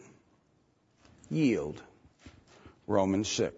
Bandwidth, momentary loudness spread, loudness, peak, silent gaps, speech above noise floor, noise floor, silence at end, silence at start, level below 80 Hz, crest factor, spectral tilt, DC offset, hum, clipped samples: 8 kHz; 17 LU; -30 LUFS; -12 dBFS; none; 40 dB; -69 dBFS; 0 s; 1.3 s; -64 dBFS; 22 dB; -5 dB/octave; under 0.1%; none; under 0.1%